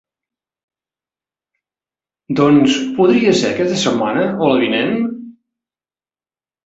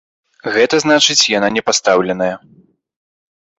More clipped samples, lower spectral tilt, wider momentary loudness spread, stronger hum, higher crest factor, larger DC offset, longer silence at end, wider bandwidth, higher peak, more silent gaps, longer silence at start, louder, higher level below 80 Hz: neither; first, -5 dB/octave vs -2 dB/octave; about the same, 9 LU vs 10 LU; neither; about the same, 18 dB vs 16 dB; neither; first, 1.35 s vs 1.2 s; about the same, 8.2 kHz vs 8.4 kHz; about the same, 0 dBFS vs 0 dBFS; neither; first, 2.3 s vs 0.45 s; about the same, -15 LUFS vs -13 LUFS; about the same, -56 dBFS vs -56 dBFS